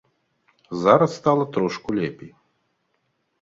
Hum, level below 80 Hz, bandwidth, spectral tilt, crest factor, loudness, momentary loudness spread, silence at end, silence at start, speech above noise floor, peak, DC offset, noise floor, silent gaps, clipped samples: none; -60 dBFS; 7.8 kHz; -7 dB/octave; 22 dB; -21 LUFS; 11 LU; 1.15 s; 0.7 s; 51 dB; -2 dBFS; under 0.1%; -72 dBFS; none; under 0.1%